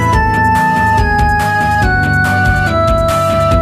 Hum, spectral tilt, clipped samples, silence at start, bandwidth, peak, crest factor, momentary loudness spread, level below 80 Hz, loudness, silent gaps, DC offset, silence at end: none; -6 dB/octave; under 0.1%; 0 s; 15.5 kHz; 0 dBFS; 10 dB; 1 LU; -20 dBFS; -11 LUFS; none; under 0.1%; 0 s